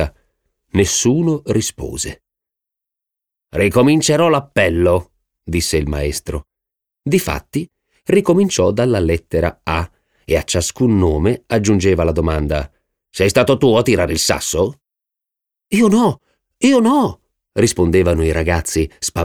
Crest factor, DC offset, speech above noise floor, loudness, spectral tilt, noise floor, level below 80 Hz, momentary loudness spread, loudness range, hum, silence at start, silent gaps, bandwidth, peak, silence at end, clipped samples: 16 dB; under 0.1%; 69 dB; -16 LUFS; -5 dB/octave; -84 dBFS; -32 dBFS; 12 LU; 3 LU; none; 0 s; none; 19 kHz; 0 dBFS; 0 s; under 0.1%